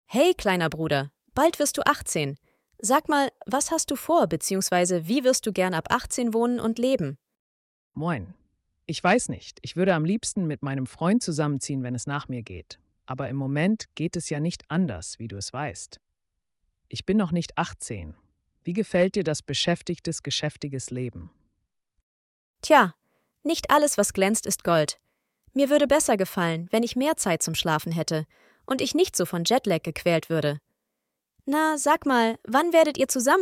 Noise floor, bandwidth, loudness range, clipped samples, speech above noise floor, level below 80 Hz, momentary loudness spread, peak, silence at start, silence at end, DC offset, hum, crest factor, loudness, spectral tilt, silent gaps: -82 dBFS; 17 kHz; 6 LU; under 0.1%; 58 dB; -56 dBFS; 13 LU; -4 dBFS; 0.1 s; 0 s; under 0.1%; none; 20 dB; -25 LUFS; -4.5 dB/octave; 7.39-7.91 s, 22.03-22.54 s